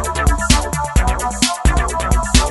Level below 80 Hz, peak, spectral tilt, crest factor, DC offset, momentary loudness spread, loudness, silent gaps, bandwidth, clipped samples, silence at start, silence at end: -18 dBFS; 0 dBFS; -3.5 dB/octave; 16 dB; under 0.1%; 4 LU; -16 LUFS; none; 12 kHz; under 0.1%; 0 s; 0 s